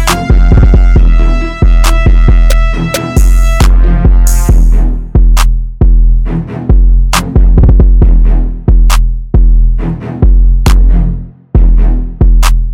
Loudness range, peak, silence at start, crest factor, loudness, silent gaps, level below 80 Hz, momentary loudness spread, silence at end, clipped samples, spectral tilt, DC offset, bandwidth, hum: 2 LU; 0 dBFS; 0 s; 6 dB; -10 LUFS; none; -6 dBFS; 6 LU; 0 s; 2%; -6 dB/octave; under 0.1%; 14 kHz; none